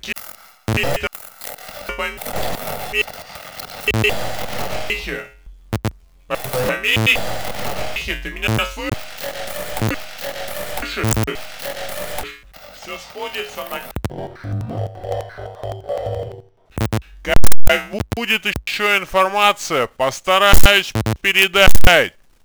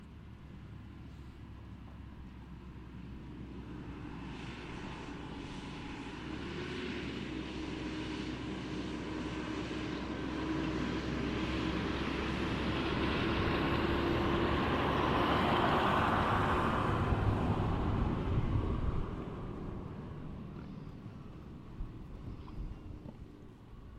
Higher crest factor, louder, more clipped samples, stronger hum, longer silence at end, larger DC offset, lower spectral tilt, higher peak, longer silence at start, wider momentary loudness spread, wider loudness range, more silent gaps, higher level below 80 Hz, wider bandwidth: about the same, 16 dB vs 18 dB; first, -20 LUFS vs -35 LUFS; neither; neither; about the same, 0 s vs 0 s; neither; second, -3.5 dB/octave vs -6.5 dB/octave; first, 0 dBFS vs -18 dBFS; about the same, 0 s vs 0 s; about the same, 17 LU vs 19 LU; second, 12 LU vs 17 LU; neither; first, -28 dBFS vs -46 dBFS; first, over 20 kHz vs 13 kHz